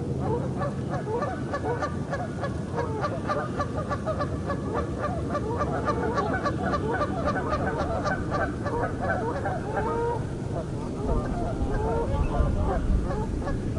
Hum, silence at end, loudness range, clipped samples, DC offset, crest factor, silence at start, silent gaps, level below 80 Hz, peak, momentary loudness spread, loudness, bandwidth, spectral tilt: none; 0 s; 2 LU; under 0.1%; under 0.1%; 16 dB; 0 s; none; -36 dBFS; -12 dBFS; 4 LU; -28 LUFS; 11.5 kHz; -7.5 dB/octave